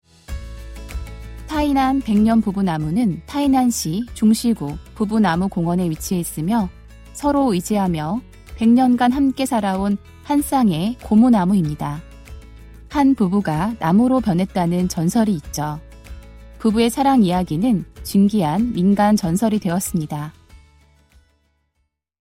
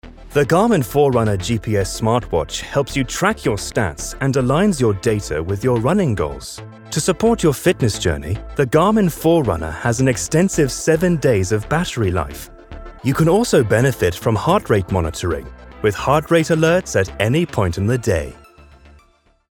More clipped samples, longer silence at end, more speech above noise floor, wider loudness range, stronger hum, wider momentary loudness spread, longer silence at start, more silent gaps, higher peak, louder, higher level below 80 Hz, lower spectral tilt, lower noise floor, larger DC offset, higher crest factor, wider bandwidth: neither; first, 1.7 s vs 1.15 s; first, 53 dB vs 39 dB; about the same, 3 LU vs 2 LU; neither; first, 13 LU vs 8 LU; first, 0.3 s vs 0.05 s; neither; second, -4 dBFS vs 0 dBFS; about the same, -19 LUFS vs -18 LUFS; about the same, -40 dBFS vs -36 dBFS; about the same, -6 dB/octave vs -5.5 dB/octave; first, -71 dBFS vs -56 dBFS; neither; about the same, 14 dB vs 16 dB; second, 16 kHz vs 20 kHz